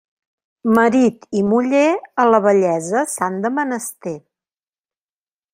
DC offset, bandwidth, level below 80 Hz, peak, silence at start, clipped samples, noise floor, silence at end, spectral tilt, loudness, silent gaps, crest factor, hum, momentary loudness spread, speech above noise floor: under 0.1%; 16 kHz; -62 dBFS; -2 dBFS; 0.65 s; under 0.1%; under -90 dBFS; 1.35 s; -5.5 dB/octave; -17 LUFS; none; 16 dB; none; 12 LU; over 74 dB